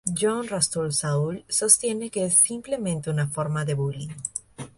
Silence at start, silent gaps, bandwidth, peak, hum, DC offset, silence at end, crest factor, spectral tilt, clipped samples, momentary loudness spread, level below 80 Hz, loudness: 0.05 s; none; 12 kHz; 0 dBFS; none; under 0.1%; 0.1 s; 26 dB; -4 dB/octave; under 0.1%; 13 LU; -58 dBFS; -23 LUFS